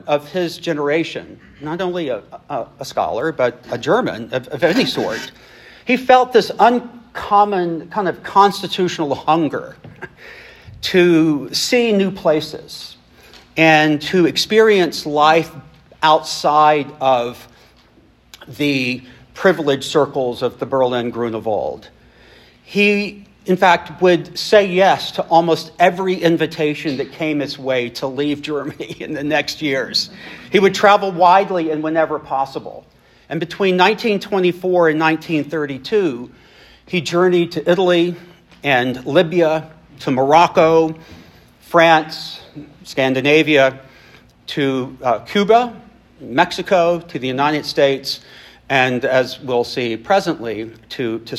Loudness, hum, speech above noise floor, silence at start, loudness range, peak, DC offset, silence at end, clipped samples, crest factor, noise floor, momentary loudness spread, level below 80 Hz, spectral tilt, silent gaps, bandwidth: -16 LUFS; none; 35 dB; 0.05 s; 5 LU; 0 dBFS; under 0.1%; 0 s; under 0.1%; 18 dB; -51 dBFS; 15 LU; -56 dBFS; -5 dB/octave; none; 15 kHz